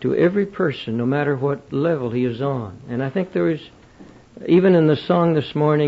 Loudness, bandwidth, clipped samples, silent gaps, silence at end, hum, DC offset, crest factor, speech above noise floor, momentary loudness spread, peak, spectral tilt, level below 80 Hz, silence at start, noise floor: -20 LUFS; 7.4 kHz; under 0.1%; none; 0 s; none; under 0.1%; 16 dB; 26 dB; 9 LU; -4 dBFS; -9 dB/octave; -56 dBFS; 0 s; -45 dBFS